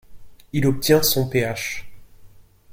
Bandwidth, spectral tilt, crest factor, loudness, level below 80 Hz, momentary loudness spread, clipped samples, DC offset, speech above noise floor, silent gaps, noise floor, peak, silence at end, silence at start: 16.5 kHz; -4.5 dB/octave; 20 dB; -20 LUFS; -46 dBFS; 12 LU; under 0.1%; under 0.1%; 27 dB; none; -46 dBFS; -4 dBFS; 0 s; 0.1 s